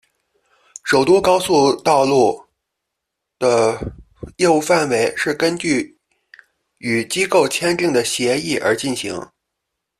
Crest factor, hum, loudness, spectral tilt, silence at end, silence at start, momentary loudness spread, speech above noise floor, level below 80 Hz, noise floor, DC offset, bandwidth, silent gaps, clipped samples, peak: 16 dB; none; -17 LUFS; -4 dB/octave; 0.75 s; 0.85 s; 15 LU; 63 dB; -50 dBFS; -79 dBFS; under 0.1%; 14 kHz; none; under 0.1%; -2 dBFS